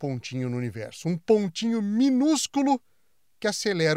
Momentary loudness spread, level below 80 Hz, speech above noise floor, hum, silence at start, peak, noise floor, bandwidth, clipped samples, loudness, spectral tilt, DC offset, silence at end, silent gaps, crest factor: 9 LU; -70 dBFS; 48 dB; none; 0 s; -8 dBFS; -73 dBFS; 15 kHz; under 0.1%; -26 LUFS; -5 dB/octave; under 0.1%; 0 s; none; 18 dB